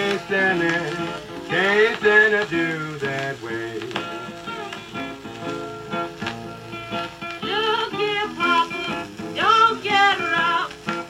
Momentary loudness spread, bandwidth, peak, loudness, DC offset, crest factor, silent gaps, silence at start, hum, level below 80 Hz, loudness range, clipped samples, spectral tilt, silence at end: 16 LU; 16 kHz; -4 dBFS; -21 LUFS; under 0.1%; 18 dB; none; 0 s; none; -58 dBFS; 11 LU; under 0.1%; -4 dB/octave; 0 s